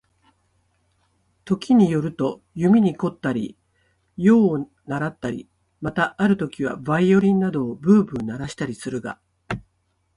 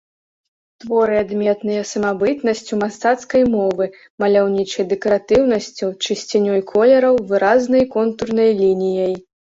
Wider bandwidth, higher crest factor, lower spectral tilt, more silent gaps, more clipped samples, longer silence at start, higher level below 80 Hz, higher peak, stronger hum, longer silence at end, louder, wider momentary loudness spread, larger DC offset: first, 11 kHz vs 8 kHz; about the same, 18 dB vs 14 dB; first, -7.5 dB/octave vs -5 dB/octave; second, none vs 4.10-4.18 s; neither; first, 1.45 s vs 0.85 s; about the same, -54 dBFS vs -52 dBFS; about the same, -4 dBFS vs -2 dBFS; neither; first, 0.55 s vs 0.35 s; second, -21 LUFS vs -17 LUFS; first, 16 LU vs 8 LU; neither